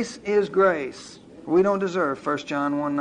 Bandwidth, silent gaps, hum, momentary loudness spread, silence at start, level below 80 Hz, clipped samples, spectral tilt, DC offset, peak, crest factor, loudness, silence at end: 10 kHz; none; none; 17 LU; 0 s; -62 dBFS; under 0.1%; -6 dB/octave; under 0.1%; -8 dBFS; 16 dB; -23 LUFS; 0 s